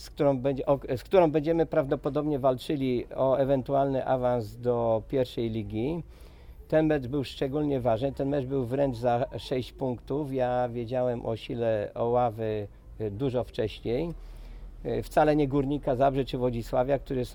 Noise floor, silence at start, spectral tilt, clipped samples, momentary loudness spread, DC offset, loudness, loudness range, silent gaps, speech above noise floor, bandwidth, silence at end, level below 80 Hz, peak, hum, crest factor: -47 dBFS; 0 s; -8 dB/octave; under 0.1%; 8 LU; under 0.1%; -28 LUFS; 4 LU; none; 20 dB; 19 kHz; 0 s; -46 dBFS; -8 dBFS; none; 20 dB